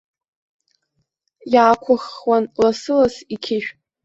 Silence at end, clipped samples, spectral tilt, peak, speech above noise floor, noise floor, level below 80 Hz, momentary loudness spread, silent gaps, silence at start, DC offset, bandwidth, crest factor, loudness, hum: 0.35 s; under 0.1%; -5 dB/octave; -2 dBFS; 54 dB; -72 dBFS; -58 dBFS; 10 LU; none; 1.45 s; under 0.1%; 8 kHz; 18 dB; -18 LUFS; none